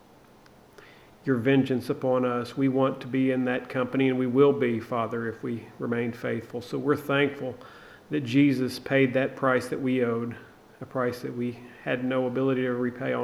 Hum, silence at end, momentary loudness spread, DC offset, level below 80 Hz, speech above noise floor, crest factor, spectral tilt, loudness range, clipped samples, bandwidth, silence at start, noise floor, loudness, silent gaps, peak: none; 0 s; 12 LU; under 0.1%; -66 dBFS; 28 dB; 18 dB; -7 dB/octave; 4 LU; under 0.1%; 13.5 kHz; 1.25 s; -54 dBFS; -27 LUFS; none; -8 dBFS